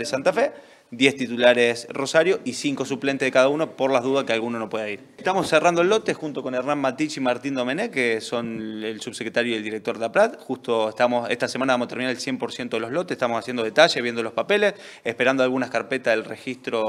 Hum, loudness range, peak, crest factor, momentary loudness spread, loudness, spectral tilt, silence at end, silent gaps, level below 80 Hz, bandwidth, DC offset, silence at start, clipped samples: none; 4 LU; 0 dBFS; 22 dB; 10 LU; -23 LUFS; -4 dB/octave; 0 s; none; -70 dBFS; 13.5 kHz; under 0.1%; 0 s; under 0.1%